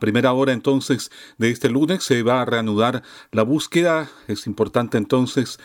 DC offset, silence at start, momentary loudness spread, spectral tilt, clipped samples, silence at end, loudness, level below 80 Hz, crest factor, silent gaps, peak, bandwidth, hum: under 0.1%; 0 s; 7 LU; -5.5 dB/octave; under 0.1%; 0.1 s; -20 LUFS; -60 dBFS; 14 dB; none; -6 dBFS; 17.5 kHz; none